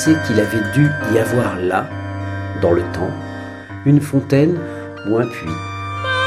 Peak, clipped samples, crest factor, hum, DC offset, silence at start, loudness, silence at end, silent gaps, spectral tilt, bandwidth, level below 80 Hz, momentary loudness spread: -2 dBFS; under 0.1%; 16 dB; none; under 0.1%; 0 s; -18 LUFS; 0 s; none; -6.5 dB/octave; 15 kHz; -46 dBFS; 11 LU